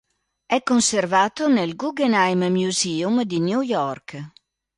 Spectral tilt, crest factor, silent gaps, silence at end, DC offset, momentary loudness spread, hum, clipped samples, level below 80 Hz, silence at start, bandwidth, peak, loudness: -4 dB/octave; 16 dB; none; 0.5 s; under 0.1%; 10 LU; none; under 0.1%; -64 dBFS; 0.5 s; 11.5 kHz; -6 dBFS; -21 LUFS